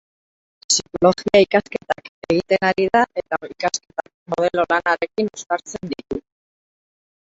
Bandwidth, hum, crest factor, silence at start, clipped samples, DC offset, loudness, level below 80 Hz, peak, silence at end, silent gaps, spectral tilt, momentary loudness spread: 8.2 kHz; none; 20 dB; 0.7 s; under 0.1%; under 0.1%; -20 LUFS; -54 dBFS; -2 dBFS; 1.2 s; 2.09-2.22 s, 4.14-4.26 s; -3.5 dB/octave; 14 LU